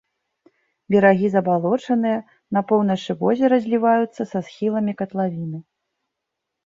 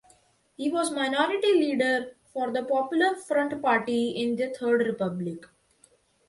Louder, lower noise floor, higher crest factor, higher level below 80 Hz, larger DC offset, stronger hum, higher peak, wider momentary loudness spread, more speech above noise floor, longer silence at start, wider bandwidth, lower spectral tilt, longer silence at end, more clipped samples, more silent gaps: first, -20 LUFS vs -26 LUFS; first, -81 dBFS vs -63 dBFS; about the same, 18 dB vs 16 dB; about the same, -66 dBFS vs -70 dBFS; neither; neither; first, -2 dBFS vs -10 dBFS; about the same, 11 LU vs 10 LU; first, 62 dB vs 37 dB; first, 0.9 s vs 0.6 s; second, 7.6 kHz vs 11.5 kHz; first, -8 dB/octave vs -4.5 dB/octave; first, 1.05 s vs 0.85 s; neither; neither